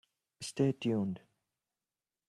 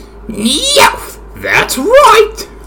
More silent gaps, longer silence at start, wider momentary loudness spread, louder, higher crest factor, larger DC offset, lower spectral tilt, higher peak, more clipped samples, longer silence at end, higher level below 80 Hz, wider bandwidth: neither; first, 0.4 s vs 0 s; second, 14 LU vs 19 LU; second, -34 LUFS vs -8 LUFS; first, 20 dB vs 10 dB; neither; first, -6.5 dB/octave vs -2 dB/octave; second, -18 dBFS vs 0 dBFS; second, under 0.1% vs 4%; first, 1.1 s vs 0 s; second, -74 dBFS vs -32 dBFS; second, 13 kHz vs over 20 kHz